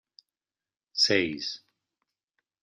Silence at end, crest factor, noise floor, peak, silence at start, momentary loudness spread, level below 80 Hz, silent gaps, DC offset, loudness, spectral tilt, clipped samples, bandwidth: 1.05 s; 22 dB; under -90 dBFS; -10 dBFS; 0.95 s; 14 LU; -74 dBFS; none; under 0.1%; -26 LUFS; -2.5 dB/octave; under 0.1%; 11.5 kHz